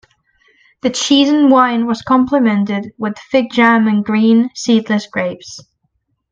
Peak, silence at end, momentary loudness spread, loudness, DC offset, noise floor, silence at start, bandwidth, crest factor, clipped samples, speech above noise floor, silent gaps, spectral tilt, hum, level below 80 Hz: 0 dBFS; 0.7 s; 11 LU; -14 LUFS; under 0.1%; -66 dBFS; 0.85 s; 9 kHz; 14 dB; under 0.1%; 53 dB; none; -4.5 dB/octave; none; -56 dBFS